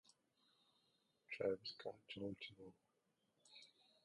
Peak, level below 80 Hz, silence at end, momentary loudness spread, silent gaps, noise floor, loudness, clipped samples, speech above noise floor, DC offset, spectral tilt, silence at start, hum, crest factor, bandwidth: -30 dBFS; -84 dBFS; 0.35 s; 20 LU; none; -85 dBFS; -49 LUFS; under 0.1%; 36 dB; under 0.1%; -5.5 dB/octave; 1.3 s; none; 22 dB; 11 kHz